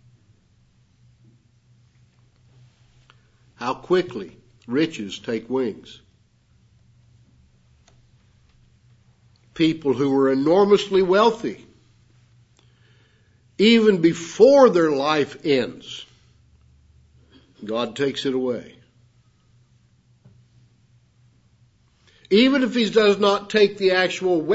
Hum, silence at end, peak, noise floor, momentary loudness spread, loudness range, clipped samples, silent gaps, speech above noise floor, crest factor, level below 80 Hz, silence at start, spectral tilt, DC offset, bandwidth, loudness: none; 0 s; -2 dBFS; -59 dBFS; 16 LU; 12 LU; under 0.1%; none; 40 dB; 20 dB; -62 dBFS; 3.6 s; -5.5 dB/octave; under 0.1%; 8 kHz; -19 LUFS